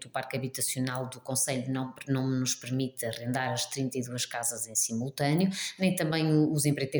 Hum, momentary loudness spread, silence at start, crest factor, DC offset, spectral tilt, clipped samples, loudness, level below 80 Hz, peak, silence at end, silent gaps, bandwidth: none; 7 LU; 0 s; 16 dB; under 0.1%; -4.5 dB/octave; under 0.1%; -30 LUFS; -70 dBFS; -14 dBFS; 0 s; none; over 20 kHz